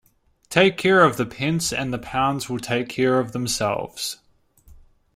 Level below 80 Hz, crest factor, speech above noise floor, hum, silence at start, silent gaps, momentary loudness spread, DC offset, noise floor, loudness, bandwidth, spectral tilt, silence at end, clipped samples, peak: -52 dBFS; 20 dB; 31 dB; none; 0.5 s; none; 11 LU; under 0.1%; -52 dBFS; -21 LUFS; 16 kHz; -4.5 dB/octave; 0.4 s; under 0.1%; -2 dBFS